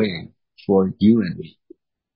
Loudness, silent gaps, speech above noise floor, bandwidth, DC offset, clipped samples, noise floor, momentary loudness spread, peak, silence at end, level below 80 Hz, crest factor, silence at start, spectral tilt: -19 LUFS; none; 33 dB; 5.4 kHz; under 0.1%; under 0.1%; -52 dBFS; 18 LU; -4 dBFS; 0.7 s; -50 dBFS; 16 dB; 0 s; -12.5 dB/octave